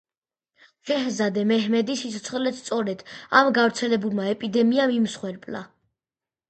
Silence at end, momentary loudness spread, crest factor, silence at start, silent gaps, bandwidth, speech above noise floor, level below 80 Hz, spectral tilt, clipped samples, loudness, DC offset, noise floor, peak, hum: 0.85 s; 14 LU; 20 dB; 0.85 s; none; 9 kHz; over 67 dB; -70 dBFS; -4.5 dB/octave; under 0.1%; -23 LUFS; under 0.1%; under -90 dBFS; -4 dBFS; none